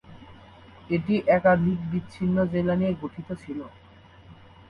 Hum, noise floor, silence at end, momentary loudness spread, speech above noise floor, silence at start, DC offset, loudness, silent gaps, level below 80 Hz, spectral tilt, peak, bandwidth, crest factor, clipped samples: none; -50 dBFS; 0.35 s; 17 LU; 26 dB; 0.1 s; under 0.1%; -25 LUFS; none; -52 dBFS; -9 dB/octave; -8 dBFS; 5.4 kHz; 18 dB; under 0.1%